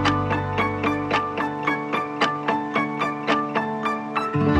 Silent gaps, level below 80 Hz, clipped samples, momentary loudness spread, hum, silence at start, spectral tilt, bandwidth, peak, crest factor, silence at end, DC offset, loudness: none; -50 dBFS; under 0.1%; 3 LU; none; 0 s; -6 dB/octave; 12 kHz; -6 dBFS; 16 dB; 0 s; under 0.1%; -24 LUFS